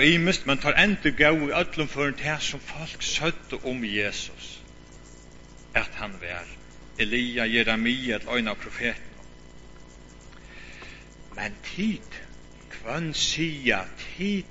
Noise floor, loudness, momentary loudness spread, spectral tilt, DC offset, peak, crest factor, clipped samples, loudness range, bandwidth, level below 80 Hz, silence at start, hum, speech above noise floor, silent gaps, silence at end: -47 dBFS; -26 LUFS; 22 LU; -4 dB/octave; under 0.1%; -4 dBFS; 24 dB; under 0.1%; 12 LU; 8 kHz; -46 dBFS; 0 s; none; 21 dB; none; 0 s